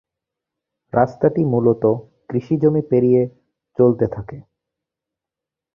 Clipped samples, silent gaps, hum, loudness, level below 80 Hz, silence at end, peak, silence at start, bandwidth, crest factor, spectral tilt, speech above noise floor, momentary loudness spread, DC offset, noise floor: under 0.1%; none; none; -18 LUFS; -52 dBFS; 1.35 s; 0 dBFS; 0.95 s; 5.8 kHz; 18 dB; -11.5 dB/octave; 70 dB; 10 LU; under 0.1%; -86 dBFS